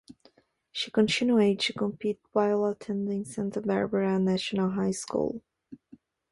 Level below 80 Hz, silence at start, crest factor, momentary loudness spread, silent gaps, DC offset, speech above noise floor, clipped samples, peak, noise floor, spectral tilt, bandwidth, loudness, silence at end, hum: -66 dBFS; 0.1 s; 18 dB; 9 LU; none; under 0.1%; 36 dB; under 0.1%; -10 dBFS; -63 dBFS; -5.5 dB/octave; 11.5 kHz; -28 LUFS; 0.55 s; none